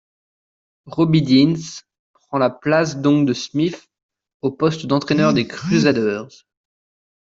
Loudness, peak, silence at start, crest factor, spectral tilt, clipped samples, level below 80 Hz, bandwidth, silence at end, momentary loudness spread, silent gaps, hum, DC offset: -18 LUFS; -4 dBFS; 0.85 s; 16 dB; -6 dB/octave; under 0.1%; -56 dBFS; 7.8 kHz; 0.95 s; 12 LU; 1.99-2.14 s, 4.03-4.09 s, 4.34-4.40 s; none; under 0.1%